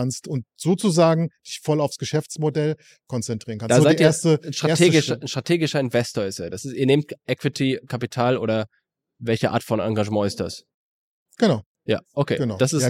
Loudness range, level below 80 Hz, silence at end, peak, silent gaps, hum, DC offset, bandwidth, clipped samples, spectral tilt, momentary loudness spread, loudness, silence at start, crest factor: 5 LU; -62 dBFS; 0 s; -4 dBFS; 10.74-11.26 s, 11.66-11.75 s; none; under 0.1%; 15.5 kHz; under 0.1%; -5.5 dB/octave; 12 LU; -22 LUFS; 0 s; 18 dB